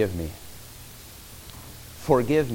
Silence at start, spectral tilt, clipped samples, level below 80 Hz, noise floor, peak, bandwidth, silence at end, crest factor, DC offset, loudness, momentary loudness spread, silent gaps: 0 s; -6 dB/octave; under 0.1%; -46 dBFS; -44 dBFS; -6 dBFS; 17 kHz; 0 s; 22 dB; under 0.1%; -25 LUFS; 21 LU; none